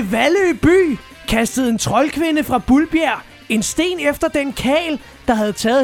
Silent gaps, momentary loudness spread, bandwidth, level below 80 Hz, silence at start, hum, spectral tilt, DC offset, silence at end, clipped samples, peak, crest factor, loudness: none; 6 LU; 17 kHz; -38 dBFS; 0 s; none; -4 dB/octave; under 0.1%; 0 s; under 0.1%; -2 dBFS; 14 dB; -17 LUFS